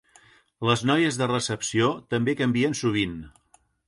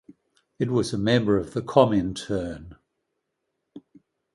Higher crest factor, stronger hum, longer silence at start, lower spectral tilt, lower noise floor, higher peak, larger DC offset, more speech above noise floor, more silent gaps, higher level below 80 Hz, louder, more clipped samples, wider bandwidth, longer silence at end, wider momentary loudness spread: about the same, 20 dB vs 24 dB; neither; about the same, 0.6 s vs 0.6 s; second, -4.5 dB/octave vs -6.5 dB/octave; second, -57 dBFS vs -79 dBFS; second, -6 dBFS vs -2 dBFS; neither; second, 33 dB vs 56 dB; neither; second, -56 dBFS vs -50 dBFS; about the same, -24 LUFS vs -24 LUFS; neither; about the same, 11.5 kHz vs 11.5 kHz; about the same, 0.6 s vs 0.55 s; second, 6 LU vs 11 LU